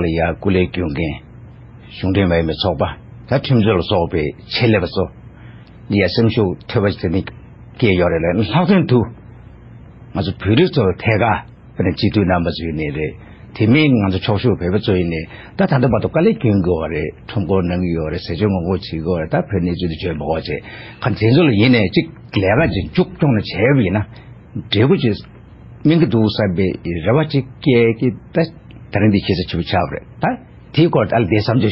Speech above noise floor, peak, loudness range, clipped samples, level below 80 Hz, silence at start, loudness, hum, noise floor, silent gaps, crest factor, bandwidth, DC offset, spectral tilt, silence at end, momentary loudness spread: 23 dB; 0 dBFS; 3 LU; under 0.1%; -34 dBFS; 0 s; -17 LUFS; none; -39 dBFS; none; 16 dB; 5.8 kHz; under 0.1%; -11 dB/octave; 0 s; 10 LU